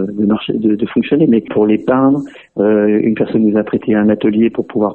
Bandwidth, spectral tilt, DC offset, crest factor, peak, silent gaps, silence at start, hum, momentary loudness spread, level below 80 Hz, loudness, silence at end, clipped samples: 4.2 kHz; -10 dB/octave; 0.1%; 12 dB; 0 dBFS; none; 0 s; none; 4 LU; -52 dBFS; -14 LUFS; 0 s; under 0.1%